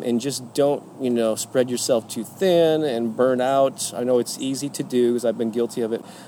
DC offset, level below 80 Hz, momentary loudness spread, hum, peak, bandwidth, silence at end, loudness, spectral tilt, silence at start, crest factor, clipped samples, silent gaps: under 0.1%; -74 dBFS; 7 LU; none; -6 dBFS; 18.5 kHz; 0 s; -22 LUFS; -4.5 dB/octave; 0 s; 14 dB; under 0.1%; none